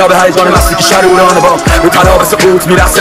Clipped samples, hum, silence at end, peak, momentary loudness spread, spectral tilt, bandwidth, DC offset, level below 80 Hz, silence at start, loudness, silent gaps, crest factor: 4%; none; 0 s; 0 dBFS; 2 LU; -4 dB/octave; 16.5 kHz; 0.7%; -18 dBFS; 0 s; -6 LUFS; none; 6 dB